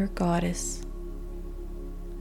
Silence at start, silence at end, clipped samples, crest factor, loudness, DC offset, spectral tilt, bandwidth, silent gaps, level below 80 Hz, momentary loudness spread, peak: 0 s; 0 s; under 0.1%; 16 dB; -33 LUFS; under 0.1%; -5.5 dB/octave; 16 kHz; none; -36 dBFS; 15 LU; -14 dBFS